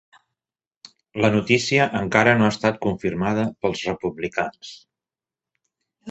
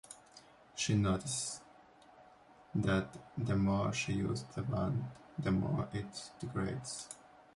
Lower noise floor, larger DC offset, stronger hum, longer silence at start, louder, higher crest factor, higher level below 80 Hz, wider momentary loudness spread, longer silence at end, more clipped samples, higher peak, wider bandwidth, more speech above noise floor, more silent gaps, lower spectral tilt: first, under -90 dBFS vs -61 dBFS; neither; neither; first, 1.15 s vs 0.1 s; first, -21 LUFS vs -37 LUFS; about the same, 22 dB vs 18 dB; about the same, -52 dBFS vs -56 dBFS; about the same, 11 LU vs 13 LU; second, 0 s vs 0.4 s; neither; first, -2 dBFS vs -20 dBFS; second, 8.2 kHz vs 11.5 kHz; first, over 69 dB vs 25 dB; neither; about the same, -5.5 dB/octave vs -5.5 dB/octave